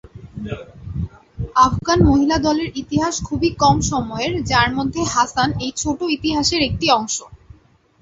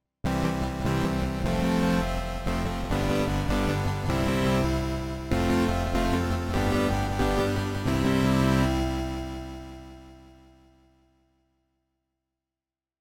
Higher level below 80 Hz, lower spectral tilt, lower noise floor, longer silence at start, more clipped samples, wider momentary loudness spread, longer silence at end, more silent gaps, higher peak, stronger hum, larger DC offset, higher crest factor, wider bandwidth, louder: about the same, -34 dBFS vs -36 dBFS; second, -4.5 dB/octave vs -6 dB/octave; second, -50 dBFS vs under -90 dBFS; about the same, 0.15 s vs 0.25 s; neither; first, 15 LU vs 8 LU; second, 0.65 s vs 2.75 s; neither; first, 0 dBFS vs -12 dBFS; neither; neither; about the same, 18 dB vs 16 dB; second, 8 kHz vs 17.5 kHz; first, -18 LUFS vs -27 LUFS